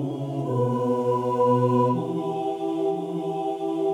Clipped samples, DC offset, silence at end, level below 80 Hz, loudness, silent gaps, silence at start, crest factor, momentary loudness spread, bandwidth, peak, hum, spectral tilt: under 0.1%; under 0.1%; 0 s; -70 dBFS; -25 LUFS; none; 0 s; 14 dB; 8 LU; 11.5 kHz; -10 dBFS; none; -9 dB/octave